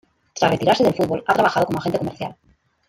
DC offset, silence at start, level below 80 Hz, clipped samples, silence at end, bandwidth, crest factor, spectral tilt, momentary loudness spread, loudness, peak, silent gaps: under 0.1%; 0.35 s; -54 dBFS; under 0.1%; 0.55 s; 16 kHz; 18 dB; -5.5 dB/octave; 14 LU; -19 LUFS; -2 dBFS; none